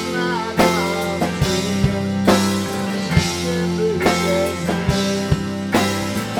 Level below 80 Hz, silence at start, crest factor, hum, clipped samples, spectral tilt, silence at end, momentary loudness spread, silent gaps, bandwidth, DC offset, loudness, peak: -38 dBFS; 0 s; 18 dB; none; under 0.1%; -5 dB/octave; 0 s; 5 LU; none; 19.5 kHz; under 0.1%; -19 LUFS; 0 dBFS